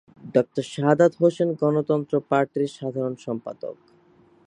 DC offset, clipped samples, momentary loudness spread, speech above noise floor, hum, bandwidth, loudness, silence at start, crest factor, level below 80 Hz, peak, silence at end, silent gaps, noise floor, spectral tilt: under 0.1%; under 0.1%; 13 LU; 34 dB; none; 10.5 kHz; -23 LUFS; 0.25 s; 20 dB; -72 dBFS; -4 dBFS; 0.75 s; none; -57 dBFS; -7.5 dB/octave